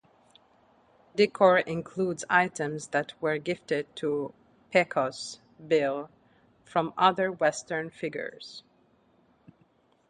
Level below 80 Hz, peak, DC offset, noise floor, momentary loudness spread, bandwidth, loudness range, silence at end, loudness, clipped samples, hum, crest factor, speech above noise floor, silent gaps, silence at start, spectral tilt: -72 dBFS; -6 dBFS; under 0.1%; -66 dBFS; 16 LU; 11 kHz; 3 LU; 1.5 s; -28 LUFS; under 0.1%; none; 22 dB; 38 dB; none; 1.15 s; -4.5 dB/octave